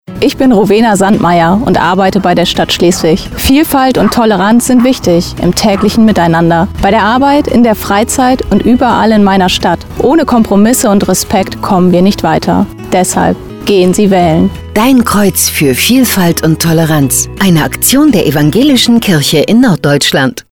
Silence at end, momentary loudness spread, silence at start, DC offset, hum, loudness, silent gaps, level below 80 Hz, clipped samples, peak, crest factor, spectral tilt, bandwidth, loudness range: 0.1 s; 4 LU; 0.1 s; under 0.1%; none; -8 LUFS; none; -30 dBFS; under 0.1%; 0 dBFS; 8 dB; -4.5 dB/octave; over 20 kHz; 2 LU